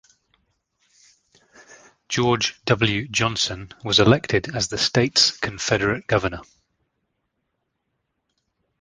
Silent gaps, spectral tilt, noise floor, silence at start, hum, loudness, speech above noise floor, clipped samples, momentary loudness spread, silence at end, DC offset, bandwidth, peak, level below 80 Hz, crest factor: none; -4 dB/octave; -76 dBFS; 2.1 s; none; -20 LUFS; 55 dB; under 0.1%; 9 LU; 2.4 s; under 0.1%; 10 kHz; -2 dBFS; -48 dBFS; 22 dB